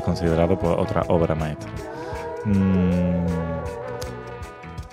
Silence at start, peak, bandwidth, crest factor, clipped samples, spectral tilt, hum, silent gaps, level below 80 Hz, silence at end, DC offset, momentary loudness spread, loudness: 0 s; -4 dBFS; 12 kHz; 18 dB; under 0.1%; -8 dB/octave; none; none; -38 dBFS; 0 s; under 0.1%; 14 LU; -23 LUFS